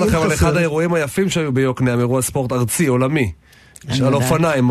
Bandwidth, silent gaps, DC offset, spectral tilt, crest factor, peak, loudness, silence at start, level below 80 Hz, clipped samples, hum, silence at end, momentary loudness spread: 13.5 kHz; none; under 0.1%; -5.5 dB/octave; 14 dB; -2 dBFS; -17 LUFS; 0 s; -36 dBFS; under 0.1%; none; 0 s; 4 LU